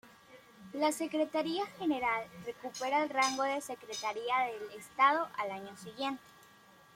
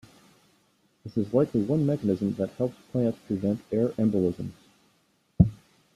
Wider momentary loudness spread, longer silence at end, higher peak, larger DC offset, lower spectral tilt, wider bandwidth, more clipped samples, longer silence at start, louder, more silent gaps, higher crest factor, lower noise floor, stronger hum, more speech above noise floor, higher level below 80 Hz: first, 15 LU vs 8 LU; first, 0.75 s vs 0.4 s; second, -14 dBFS vs -4 dBFS; neither; second, -2.5 dB/octave vs -10 dB/octave; first, 16.5 kHz vs 13 kHz; neither; second, 0.05 s vs 1.05 s; second, -34 LUFS vs -27 LUFS; neither; about the same, 22 dB vs 24 dB; second, -60 dBFS vs -68 dBFS; neither; second, 26 dB vs 41 dB; second, -76 dBFS vs -48 dBFS